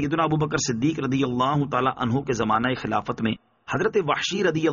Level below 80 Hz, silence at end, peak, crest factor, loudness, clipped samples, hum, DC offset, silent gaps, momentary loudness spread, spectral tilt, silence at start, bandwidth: -52 dBFS; 0 s; -8 dBFS; 16 dB; -24 LUFS; under 0.1%; none; under 0.1%; none; 5 LU; -4.5 dB/octave; 0 s; 7.2 kHz